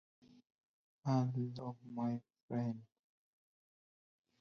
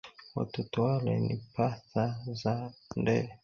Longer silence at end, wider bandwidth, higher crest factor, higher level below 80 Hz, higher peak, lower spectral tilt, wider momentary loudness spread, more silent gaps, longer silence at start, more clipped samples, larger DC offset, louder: first, 1.55 s vs 0.1 s; about the same, 6.8 kHz vs 7 kHz; about the same, 20 dB vs 18 dB; second, -82 dBFS vs -62 dBFS; second, -24 dBFS vs -14 dBFS; about the same, -9 dB/octave vs -8 dB/octave; first, 11 LU vs 7 LU; first, 2.43-2.48 s vs none; first, 1.05 s vs 0.05 s; neither; neither; second, -41 LUFS vs -33 LUFS